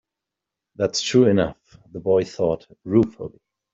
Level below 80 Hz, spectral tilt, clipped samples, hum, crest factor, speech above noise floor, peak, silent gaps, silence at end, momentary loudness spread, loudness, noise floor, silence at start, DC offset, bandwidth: -54 dBFS; -5.5 dB/octave; under 0.1%; none; 18 dB; 64 dB; -4 dBFS; none; 0.45 s; 16 LU; -21 LUFS; -85 dBFS; 0.8 s; under 0.1%; 8 kHz